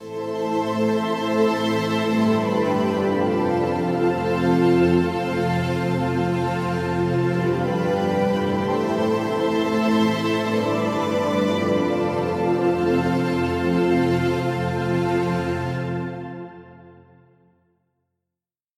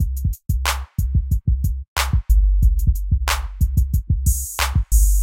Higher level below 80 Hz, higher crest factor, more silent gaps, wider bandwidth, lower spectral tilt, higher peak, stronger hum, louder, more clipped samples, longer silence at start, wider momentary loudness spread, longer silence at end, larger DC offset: second, -50 dBFS vs -18 dBFS; about the same, 14 dB vs 16 dB; second, none vs 1.88-1.96 s; about the same, 15 kHz vs 16.5 kHz; first, -7 dB/octave vs -4 dB/octave; second, -6 dBFS vs -2 dBFS; neither; about the same, -22 LUFS vs -21 LUFS; neither; about the same, 0 s vs 0 s; about the same, 4 LU vs 5 LU; first, 1.85 s vs 0 s; neither